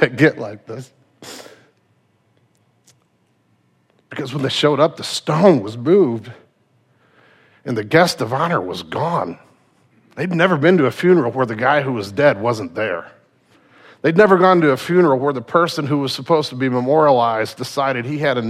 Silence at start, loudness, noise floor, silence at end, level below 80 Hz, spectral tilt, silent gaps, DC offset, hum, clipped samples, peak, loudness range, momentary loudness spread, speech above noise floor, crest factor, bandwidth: 0 s; -17 LUFS; -62 dBFS; 0 s; -64 dBFS; -6 dB/octave; none; under 0.1%; none; under 0.1%; 0 dBFS; 7 LU; 15 LU; 45 dB; 18 dB; 15 kHz